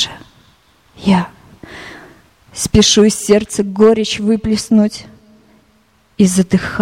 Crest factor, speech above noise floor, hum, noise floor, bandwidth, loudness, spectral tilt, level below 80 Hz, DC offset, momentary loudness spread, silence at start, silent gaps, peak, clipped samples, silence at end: 16 dB; 42 dB; none; -54 dBFS; 15.5 kHz; -13 LUFS; -4.5 dB/octave; -38 dBFS; under 0.1%; 22 LU; 0 s; none; 0 dBFS; under 0.1%; 0 s